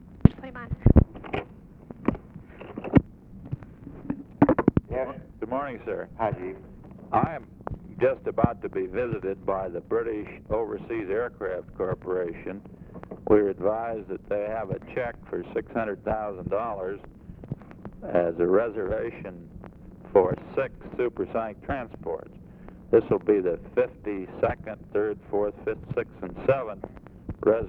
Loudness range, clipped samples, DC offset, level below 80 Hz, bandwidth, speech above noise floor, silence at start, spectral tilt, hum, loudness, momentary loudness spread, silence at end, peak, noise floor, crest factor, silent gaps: 4 LU; under 0.1%; under 0.1%; -40 dBFS; 4.4 kHz; 18 dB; 0.05 s; -11 dB/octave; none; -28 LUFS; 20 LU; 0 s; 0 dBFS; -46 dBFS; 28 dB; none